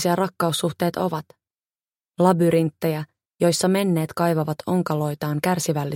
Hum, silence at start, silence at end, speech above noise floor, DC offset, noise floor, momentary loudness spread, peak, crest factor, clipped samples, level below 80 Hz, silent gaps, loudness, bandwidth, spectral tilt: none; 0 s; 0 s; over 69 dB; under 0.1%; under -90 dBFS; 7 LU; -4 dBFS; 18 dB; under 0.1%; -64 dBFS; none; -22 LUFS; 17 kHz; -5.5 dB/octave